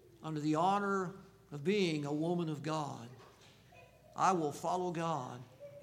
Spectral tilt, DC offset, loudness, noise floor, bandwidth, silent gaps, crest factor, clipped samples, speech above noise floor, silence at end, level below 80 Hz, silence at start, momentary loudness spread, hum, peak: -6 dB/octave; under 0.1%; -36 LUFS; -61 dBFS; 16 kHz; none; 22 dB; under 0.1%; 26 dB; 0 s; -74 dBFS; 0.2 s; 18 LU; none; -14 dBFS